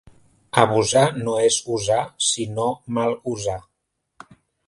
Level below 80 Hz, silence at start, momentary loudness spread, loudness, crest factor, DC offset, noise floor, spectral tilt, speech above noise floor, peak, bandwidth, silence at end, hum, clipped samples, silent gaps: -54 dBFS; 0.55 s; 9 LU; -21 LUFS; 22 dB; under 0.1%; -76 dBFS; -3.5 dB/octave; 55 dB; 0 dBFS; 11.5 kHz; 1.05 s; none; under 0.1%; none